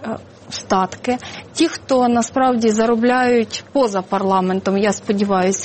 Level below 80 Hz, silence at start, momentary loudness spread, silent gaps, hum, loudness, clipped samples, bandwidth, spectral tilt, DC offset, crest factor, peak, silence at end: -54 dBFS; 0 s; 9 LU; none; none; -17 LUFS; under 0.1%; 8.8 kHz; -4.5 dB/octave; under 0.1%; 16 dB; -2 dBFS; 0 s